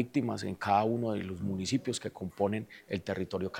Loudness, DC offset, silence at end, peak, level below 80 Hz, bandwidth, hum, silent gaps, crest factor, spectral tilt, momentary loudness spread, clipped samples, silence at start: -33 LUFS; under 0.1%; 0 s; -14 dBFS; -66 dBFS; 16.5 kHz; none; none; 18 dB; -5.5 dB/octave; 10 LU; under 0.1%; 0 s